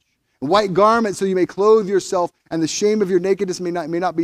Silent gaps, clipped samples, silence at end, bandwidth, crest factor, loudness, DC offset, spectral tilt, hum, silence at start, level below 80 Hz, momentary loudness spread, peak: none; under 0.1%; 0 s; 13 kHz; 16 dB; -18 LUFS; under 0.1%; -5 dB/octave; none; 0.4 s; -56 dBFS; 8 LU; -2 dBFS